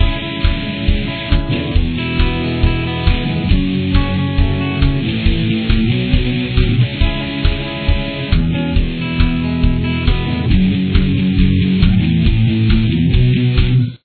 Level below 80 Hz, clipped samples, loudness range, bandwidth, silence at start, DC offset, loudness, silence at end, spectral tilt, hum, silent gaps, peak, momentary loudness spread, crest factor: -18 dBFS; under 0.1%; 3 LU; 4.6 kHz; 0 s; under 0.1%; -16 LUFS; 0.1 s; -10 dB/octave; none; none; 0 dBFS; 5 LU; 14 dB